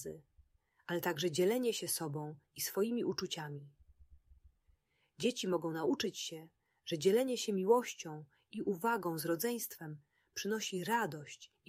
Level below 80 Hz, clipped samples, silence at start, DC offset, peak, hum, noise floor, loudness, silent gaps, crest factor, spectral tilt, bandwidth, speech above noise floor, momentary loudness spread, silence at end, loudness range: -74 dBFS; under 0.1%; 0 s; under 0.1%; -18 dBFS; none; -74 dBFS; -36 LUFS; none; 20 dB; -4 dB/octave; 16 kHz; 38 dB; 17 LU; 0.2 s; 5 LU